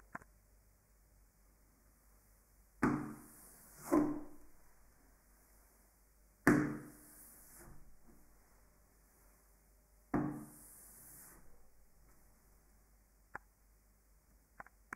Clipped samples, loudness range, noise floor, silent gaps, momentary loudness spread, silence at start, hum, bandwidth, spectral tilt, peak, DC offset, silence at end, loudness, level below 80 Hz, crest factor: under 0.1%; 20 LU; -69 dBFS; none; 24 LU; 0.15 s; none; 16 kHz; -6.5 dB/octave; -12 dBFS; under 0.1%; 3.45 s; -37 LUFS; -64 dBFS; 32 dB